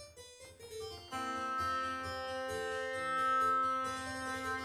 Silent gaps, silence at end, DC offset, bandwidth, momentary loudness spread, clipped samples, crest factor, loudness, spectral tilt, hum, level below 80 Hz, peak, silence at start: none; 0 s; under 0.1%; 16 kHz; 17 LU; under 0.1%; 12 dB; -36 LUFS; -3 dB/octave; none; -66 dBFS; -24 dBFS; 0 s